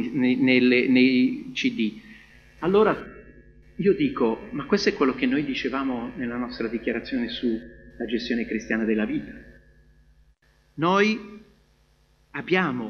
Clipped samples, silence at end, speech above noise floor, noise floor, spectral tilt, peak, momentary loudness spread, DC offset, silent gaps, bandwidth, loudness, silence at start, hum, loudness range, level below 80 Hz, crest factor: under 0.1%; 0 s; 38 dB; -61 dBFS; -6 dB/octave; -6 dBFS; 14 LU; under 0.1%; none; 6.8 kHz; -24 LUFS; 0 s; 60 Hz at -50 dBFS; 6 LU; -54 dBFS; 18 dB